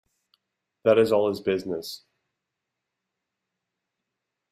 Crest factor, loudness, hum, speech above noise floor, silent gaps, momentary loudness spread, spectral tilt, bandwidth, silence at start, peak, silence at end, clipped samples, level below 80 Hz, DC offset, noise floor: 22 dB; -24 LUFS; none; 61 dB; none; 17 LU; -6 dB/octave; 15.5 kHz; 0.85 s; -8 dBFS; 2.55 s; under 0.1%; -68 dBFS; under 0.1%; -84 dBFS